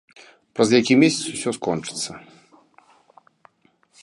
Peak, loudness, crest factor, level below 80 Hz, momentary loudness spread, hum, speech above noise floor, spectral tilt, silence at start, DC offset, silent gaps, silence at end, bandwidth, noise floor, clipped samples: -2 dBFS; -20 LUFS; 20 dB; -64 dBFS; 15 LU; none; 42 dB; -4 dB/octave; 0.55 s; under 0.1%; none; 1.85 s; 11.5 kHz; -62 dBFS; under 0.1%